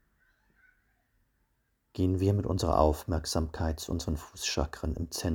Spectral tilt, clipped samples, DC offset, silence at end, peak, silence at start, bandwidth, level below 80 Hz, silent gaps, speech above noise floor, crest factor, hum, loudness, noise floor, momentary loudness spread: -5.5 dB/octave; under 0.1%; under 0.1%; 0 s; -8 dBFS; 1.95 s; over 20 kHz; -40 dBFS; none; 46 dB; 22 dB; none; -31 LUFS; -75 dBFS; 8 LU